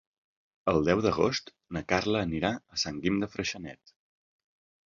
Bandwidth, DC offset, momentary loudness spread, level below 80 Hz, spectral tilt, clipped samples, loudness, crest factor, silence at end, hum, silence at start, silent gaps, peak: 7.6 kHz; under 0.1%; 12 LU; -52 dBFS; -5 dB/octave; under 0.1%; -29 LUFS; 22 dB; 1.15 s; none; 0.65 s; none; -8 dBFS